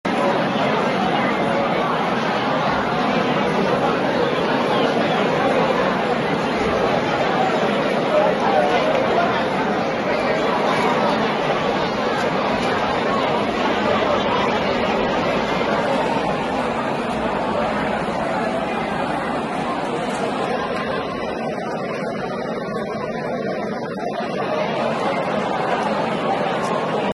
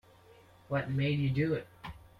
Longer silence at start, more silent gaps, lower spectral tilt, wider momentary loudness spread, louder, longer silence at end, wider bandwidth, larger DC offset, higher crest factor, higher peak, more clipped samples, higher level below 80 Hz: second, 0.05 s vs 0.7 s; neither; second, -5.5 dB/octave vs -8.5 dB/octave; second, 7 LU vs 14 LU; first, -20 LUFS vs -32 LUFS; about the same, 0 s vs 0.1 s; first, 12 kHz vs 5.4 kHz; neither; about the same, 14 dB vs 16 dB; first, -6 dBFS vs -20 dBFS; neither; first, -48 dBFS vs -58 dBFS